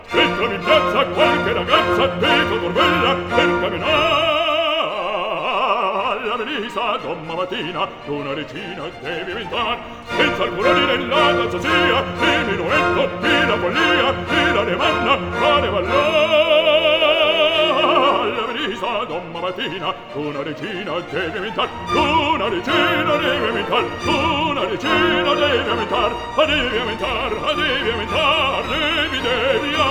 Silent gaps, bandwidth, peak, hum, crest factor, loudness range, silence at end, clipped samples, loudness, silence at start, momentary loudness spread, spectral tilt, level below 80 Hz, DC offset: none; 17.5 kHz; 0 dBFS; none; 18 dB; 7 LU; 0 s; under 0.1%; -18 LUFS; 0 s; 10 LU; -4.5 dB/octave; -42 dBFS; under 0.1%